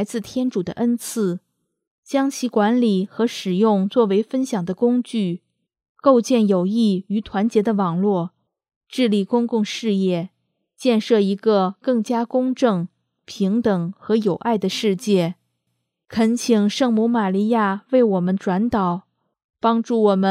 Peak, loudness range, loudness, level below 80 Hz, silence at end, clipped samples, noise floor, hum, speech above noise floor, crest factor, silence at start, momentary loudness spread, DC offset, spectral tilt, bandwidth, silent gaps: -2 dBFS; 2 LU; -20 LUFS; -60 dBFS; 0 s; under 0.1%; -75 dBFS; none; 56 dB; 18 dB; 0 s; 7 LU; under 0.1%; -6.5 dB/octave; 14 kHz; 1.87-2.03 s, 5.89-5.95 s, 8.76-8.81 s, 19.44-19.54 s